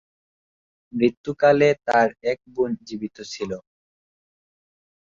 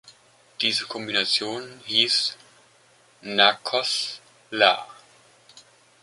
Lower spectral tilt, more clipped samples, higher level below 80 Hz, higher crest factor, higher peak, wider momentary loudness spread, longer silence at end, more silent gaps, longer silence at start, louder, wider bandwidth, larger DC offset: first, -6 dB/octave vs -1.5 dB/octave; neither; first, -62 dBFS vs -74 dBFS; second, 18 dB vs 24 dB; second, -6 dBFS vs -2 dBFS; about the same, 15 LU vs 15 LU; first, 1.45 s vs 0.4 s; first, 1.17-1.24 s vs none; first, 0.95 s vs 0.05 s; about the same, -22 LUFS vs -22 LUFS; second, 7.6 kHz vs 11.5 kHz; neither